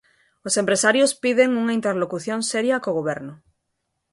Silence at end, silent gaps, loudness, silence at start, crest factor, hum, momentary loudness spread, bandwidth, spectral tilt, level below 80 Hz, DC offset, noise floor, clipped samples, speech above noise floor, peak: 0.8 s; none; -21 LUFS; 0.45 s; 20 dB; none; 10 LU; 12 kHz; -3 dB/octave; -66 dBFS; under 0.1%; -76 dBFS; under 0.1%; 55 dB; -4 dBFS